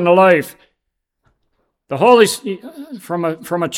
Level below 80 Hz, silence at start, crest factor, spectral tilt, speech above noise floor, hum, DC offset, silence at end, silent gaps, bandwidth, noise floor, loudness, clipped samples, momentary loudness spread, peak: -66 dBFS; 0 s; 16 dB; -4.5 dB/octave; 60 dB; none; under 0.1%; 0 s; none; 16.5 kHz; -75 dBFS; -14 LUFS; under 0.1%; 21 LU; 0 dBFS